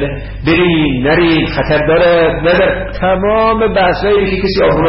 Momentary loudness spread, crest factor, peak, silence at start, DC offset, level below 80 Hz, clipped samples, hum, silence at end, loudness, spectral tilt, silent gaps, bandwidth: 4 LU; 8 dB; -2 dBFS; 0 s; under 0.1%; -26 dBFS; under 0.1%; none; 0 s; -11 LUFS; -11 dB/octave; none; 5.8 kHz